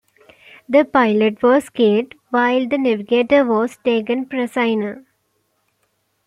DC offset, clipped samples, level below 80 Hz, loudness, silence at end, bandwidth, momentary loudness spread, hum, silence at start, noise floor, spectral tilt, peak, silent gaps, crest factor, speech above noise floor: under 0.1%; under 0.1%; -62 dBFS; -17 LUFS; 1.25 s; 12.5 kHz; 7 LU; none; 0.7 s; -67 dBFS; -6 dB/octave; -2 dBFS; none; 16 dB; 51 dB